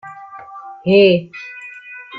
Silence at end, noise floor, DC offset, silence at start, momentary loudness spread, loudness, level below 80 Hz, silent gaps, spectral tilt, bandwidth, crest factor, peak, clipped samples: 0 s; -35 dBFS; under 0.1%; 0.05 s; 23 LU; -14 LUFS; -58 dBFS; none; -7.5 dB/octave; 5.4 kHz; 16 dB; -2 dBFS; under 0.1%